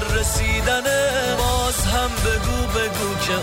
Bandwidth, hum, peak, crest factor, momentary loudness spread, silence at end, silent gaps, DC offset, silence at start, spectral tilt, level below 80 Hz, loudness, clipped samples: 16 kHz; none; -10 dBFS; 12 dB; 3 LU; 0 s; none; under 0.1%; 0 s; -3.5 dB/octave; -26 dBFS; -20 LUFS; under 0.1%